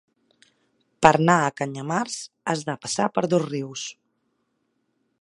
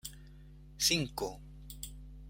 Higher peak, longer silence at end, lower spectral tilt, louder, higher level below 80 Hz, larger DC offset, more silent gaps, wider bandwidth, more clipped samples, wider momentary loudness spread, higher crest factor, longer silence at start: first, 0 dBFS vs -16 dBFS; first, 1.3 s vs 0 s; first, -5 dB/octave vs -2.5 dB/octave; first, -23 LUFS vs -32 LUFS; second, -58 dBFS vs -52 dBFS; neither; neither; second, 11.5 kHz vs 16.5 kHz; neither; second, 13 LU vs 24 LU; about the same, 24 dB vs 22 dB; first, 1 s vs 0.05 s